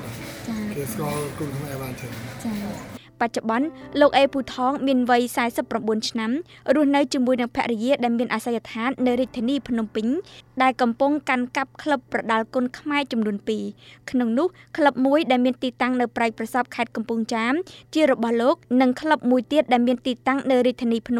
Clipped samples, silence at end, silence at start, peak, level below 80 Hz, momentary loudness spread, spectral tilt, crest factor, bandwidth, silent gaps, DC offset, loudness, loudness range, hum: under 0.1%; 0 s; 0 s; -4 dBFS; -56 dBFS; 10 LU; -5 dB/octave; 18 dB; over 20 kHz; none; under 0.1%; -23 LUFS; 4 LU; none